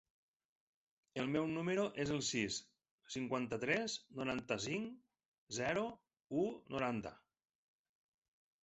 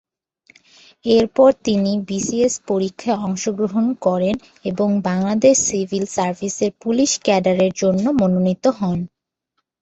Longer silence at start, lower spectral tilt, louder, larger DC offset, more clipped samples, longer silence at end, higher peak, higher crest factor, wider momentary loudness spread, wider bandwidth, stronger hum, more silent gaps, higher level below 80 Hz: about the same, 1.15 s vs 1.05 s; about the same, -4 dB/octave vs -5 dB/octave; second, -40 LUFS vs -18 LUFS; neither; neither; first, 1.5 s vs 0.75 s; second, -20 dBFS vs -2 dBFS; about the same, 22 dB vs 18 dB; about the same, 8 LU vs 8 LU; about the same, 8.2 kHz vs 8.2 kHz; neither; first, 2.91-2.98 s, 5.28-5.32 s, 5.38-5.47 s vs none; second, -72 dBFS vs -54 dBFS